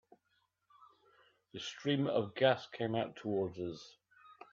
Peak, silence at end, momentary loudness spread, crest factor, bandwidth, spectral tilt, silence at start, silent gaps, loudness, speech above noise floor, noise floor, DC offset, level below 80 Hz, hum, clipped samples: -16 dBFS; 0.2 s; 20 LU; 22 dB; 7.6 kHz; -6 dB/octave; 0.8 s; none; -36 LUFS; 44 dB; -79 dBFS; under 0.1%; -78 dBFS; none; under 0.1%